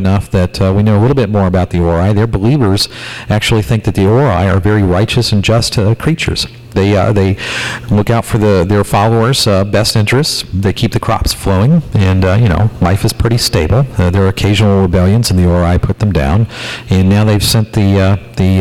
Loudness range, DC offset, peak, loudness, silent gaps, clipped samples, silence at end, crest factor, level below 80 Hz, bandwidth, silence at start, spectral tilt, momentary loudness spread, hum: 1 LU; 0.6%; -4 dBFS; -11 LUFS; none; under 0.1%; 0 s; 8 dB; -28 dBFS; 15.5 kHz; 0 s; -6 dB/octave; 4 LU; none